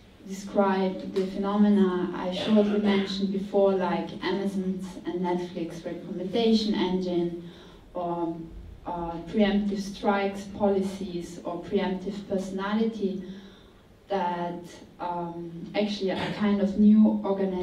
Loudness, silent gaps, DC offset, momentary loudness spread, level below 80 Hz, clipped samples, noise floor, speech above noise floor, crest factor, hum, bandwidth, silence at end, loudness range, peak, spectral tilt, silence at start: -27 LUFS; none; under 0.1%; 14 LU; -54 dBFS; under 0.1%; -53 dBFS; 27 dB; 18 dB; none; 10.5 kHz; 0 s; 7 LU; -10 dBFS; -7 dB/octave; 0.25 s